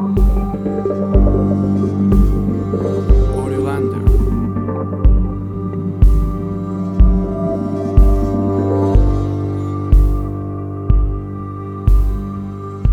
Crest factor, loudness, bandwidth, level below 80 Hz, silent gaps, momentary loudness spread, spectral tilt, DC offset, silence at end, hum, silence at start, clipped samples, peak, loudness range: 14 dB; -17 LUFS; 4.1 kHz; -16 dBFS; none; 9 LU; -10 dB/octave; under 0.1%; 0 s; none; 0 s; under 0.1%; 0 dBFS; 2 LU